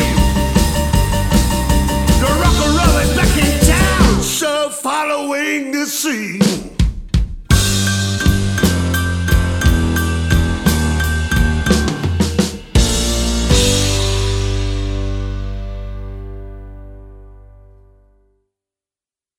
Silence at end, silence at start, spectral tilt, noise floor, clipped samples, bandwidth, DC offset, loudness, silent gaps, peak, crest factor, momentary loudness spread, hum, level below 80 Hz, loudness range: 1.95 s; 0 s; -4.5 dB/octave; under -90 dBFS; under 0.1%; 17.5 kHz; 0.2%; -15 LUFS; none; 0 dBFS; 16 dB; 10 LU; none; -20 dBFS; 11 LU